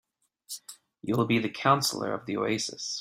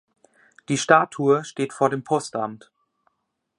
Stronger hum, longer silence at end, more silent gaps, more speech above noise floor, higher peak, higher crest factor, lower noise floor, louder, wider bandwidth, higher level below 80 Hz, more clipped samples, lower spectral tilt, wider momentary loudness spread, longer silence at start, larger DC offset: neither; second, 0 s vs 1 s; neither; second, 21 dB vs 55 dB; second, -8 dBFS vs -2 dBFS; about the same, 22 dB vs 22 dB; second, -49 dBFS vs -77 dBFS; second, -27 LUFS vs -22 LUFS; first, 16 kHz vs 11.5 kHz; about the same, -66 dBFS vs -70 dBFS; neither; about the same, -4 dB/octave vs -4.5 dB/octave; first, 17 LU vs 12 LU; second, 0.5 s vs 0.7 s; neither